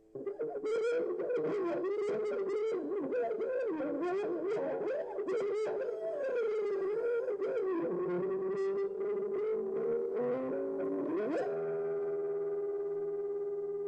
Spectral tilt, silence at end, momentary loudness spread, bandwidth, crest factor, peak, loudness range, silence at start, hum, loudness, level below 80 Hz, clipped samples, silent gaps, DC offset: -7 dB/octave; 0 s; 3 LU; 8.6 kHz; 10 dB; -26 dBFS; 1 LU; 0.15 s; none; -35 LUFS; -78 dBFS; under 0.1%; none; under 0.1%